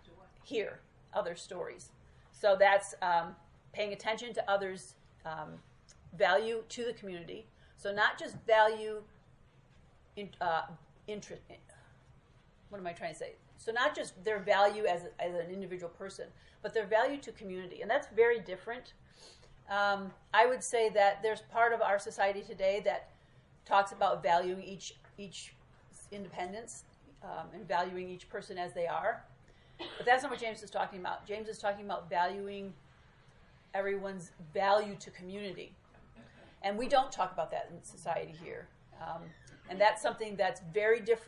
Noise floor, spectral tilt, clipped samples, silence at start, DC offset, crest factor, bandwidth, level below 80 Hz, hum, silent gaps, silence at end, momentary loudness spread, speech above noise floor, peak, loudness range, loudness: -63 dBFS; -3.5 dB/octave; under 0.1%; 0.1 s; under 0.1%; 24 dB; 11.5 kHz; -66 dBFS; none; none; 0 s; 18 LU; 29 dB; -12 dBFS; 9 LU; -34 LUFS